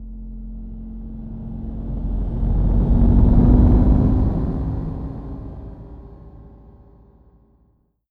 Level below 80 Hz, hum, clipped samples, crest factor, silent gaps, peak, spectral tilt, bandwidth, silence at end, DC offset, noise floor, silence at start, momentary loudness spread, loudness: -22 dBFS; none; under 0.1%; 18 dB; none; -2 dBFS; -12 dB/octave; 2.1 kHz; 1.6 s; under 0.1%; -61 dBFS; 0 s; 22 LU; -19 LUFS